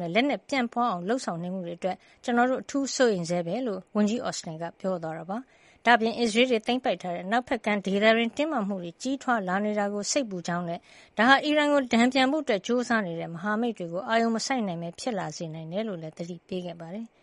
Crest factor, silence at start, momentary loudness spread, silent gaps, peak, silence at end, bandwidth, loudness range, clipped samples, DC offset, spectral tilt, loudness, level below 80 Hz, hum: 22 dB; 0 s; 13 LU; none; -4 dBFS; 0.15 s; 11.5 kHz; 5 LU; under 0.1%; under 0.1%; -4.5 dB/octave; -27 LUFS; -68 dBFS; none